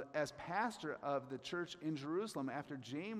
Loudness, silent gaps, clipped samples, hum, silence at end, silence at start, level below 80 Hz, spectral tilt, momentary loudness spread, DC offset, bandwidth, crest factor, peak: -43 LUFS; none; under 0.1%; none; 0 s; 0 s; -80 dBFS; -5 dB/octave; 5 LU; under 0.1%; 15 kHz; 18 dB; -24 dBFS